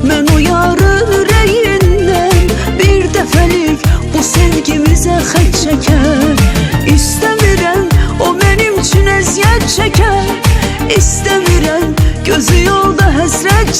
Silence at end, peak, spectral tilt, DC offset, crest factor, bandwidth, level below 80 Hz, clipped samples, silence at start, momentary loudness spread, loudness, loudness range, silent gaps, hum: 0 s; 0 dBFS; -4.5 dB/octave; under 0.1%; 8 dB; 16.5 kHz; -16 dBFS; 0.3%; 0 s; 3 LU; -10 LUFS; 1 LU; none; none